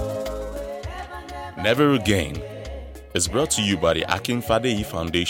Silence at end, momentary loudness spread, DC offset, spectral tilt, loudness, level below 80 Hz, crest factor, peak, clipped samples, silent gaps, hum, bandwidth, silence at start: 0 s; 16 LU; under 0.1%; -4 dB/octave; -23 LUFS; -40 dBFS; 18 dB; -4 dBFS; under 0.1%; none; none; 17 kHz; 0 s